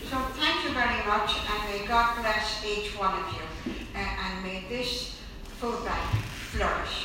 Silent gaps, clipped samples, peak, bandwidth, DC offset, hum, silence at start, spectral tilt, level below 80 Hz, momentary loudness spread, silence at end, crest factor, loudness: none; under 0.1%; -10 dBFS; 16 kHz; under 0.1%; none; 0 s; -4 dB/octave; -40 dBFS; 10 LU; 0 s; 18 dB; -29 LUFS